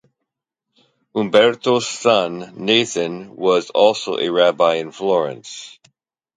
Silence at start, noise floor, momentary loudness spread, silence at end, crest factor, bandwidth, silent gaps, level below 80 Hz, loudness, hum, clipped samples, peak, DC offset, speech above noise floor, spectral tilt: 1.15 s; -81 dBFS; 12 LU; 0.7 s; 18 dB; 9.4 kHz; none; -66 dBFS; -18 LUFS; none; under 0.1%; 0 dBFS; under 0.1%; 64 dB; -3.5 dB/octave